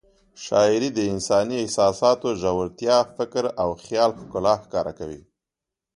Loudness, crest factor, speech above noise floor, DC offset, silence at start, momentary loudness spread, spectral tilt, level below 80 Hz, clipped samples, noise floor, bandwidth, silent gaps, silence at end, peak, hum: -22 LUFS; 18 dB; 65 dB; under 0.1%; 0.4 s; 9 LU; -4.5 dB/octave; -52 dBFS; under 0.1%; -87 dBFS; 11.5 kHz; none; 0.8 s; -4 dBFS; none